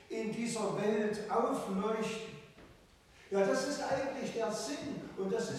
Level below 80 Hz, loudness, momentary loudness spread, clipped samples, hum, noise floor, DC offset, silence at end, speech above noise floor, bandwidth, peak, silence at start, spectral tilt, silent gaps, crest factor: -68 dBFS; -35 LUFS; 8 LU; under 0.1%; none; -61 dBFS; under 0.1%; 0 s; 26 dB; 15 kHz; -18 dBFS; 0 s; -4.5 dB/octave; none; 18 dB